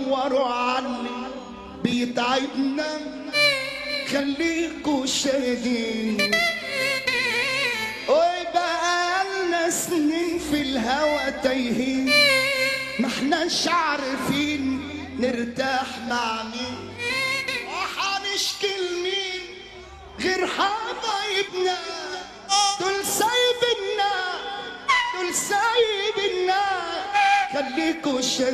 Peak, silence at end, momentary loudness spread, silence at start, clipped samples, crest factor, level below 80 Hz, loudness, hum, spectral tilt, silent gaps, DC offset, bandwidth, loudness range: -4 dBFS; 0 s; 9 LU; 0 s; under 0.1%; 20 dB; -54 dBFS; -23 LUFS; none; -2.5 dB/octave; none; under 0.1%; 14.5 kHz; 5 LU